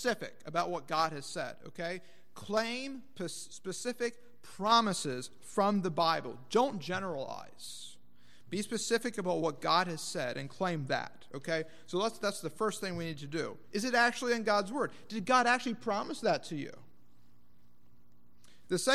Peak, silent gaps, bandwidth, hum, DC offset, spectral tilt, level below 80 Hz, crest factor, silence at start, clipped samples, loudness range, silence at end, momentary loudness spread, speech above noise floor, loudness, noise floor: -12 dBFS; none; 15.5 kHz; none; 0.4%; -4 dB/octave; -72 dBFS; 22 dB; 0 s; under 0.1%; 6 LU; 0 s; 14 LU; 34 dB; -34 LUFS; -68 dBFS